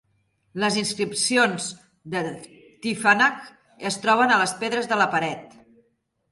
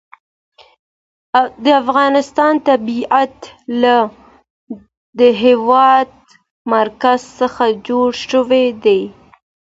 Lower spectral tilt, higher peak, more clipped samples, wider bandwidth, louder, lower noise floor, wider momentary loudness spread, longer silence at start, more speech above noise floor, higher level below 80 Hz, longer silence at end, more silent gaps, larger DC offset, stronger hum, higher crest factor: second, -3 dB/octave vs -4.5 dB/octave; second, -4 dBFS vs 0 dBFS; neither; first, 11.5 kHz vs 7.8 kHz; second, -22 LUFS vs -14 LUFS; second, -70 dBFS vs under -90 dBFS; about the same, 15 LU vs 16 LU; second, 0.55 s vs 1.35 s; second, 47 dB vs over 77 dB; second, -68 dBFS vs -58 dBFS; first, 0.85 s vs 0.5 s; second, none vs 4.50-4.67 s, 4.97-5.13 s, 6.51-6.65 s; neither; neither; first, 20 dB vs 14 dB